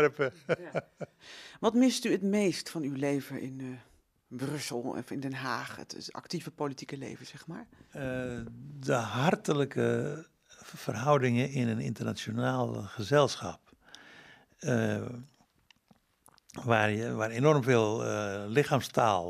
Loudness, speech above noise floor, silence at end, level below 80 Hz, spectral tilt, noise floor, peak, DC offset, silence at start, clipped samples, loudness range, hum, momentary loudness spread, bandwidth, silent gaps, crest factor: -31 LUFS; 36 dB; 0 s; -68 dBFS; -5.5 dB/octave; -67 dBFS; -10 dBFS; under 0.1%; 0 s; under 0.1%; 8 LU; none; 18 LU; 14.5 kHz; none; 22 dB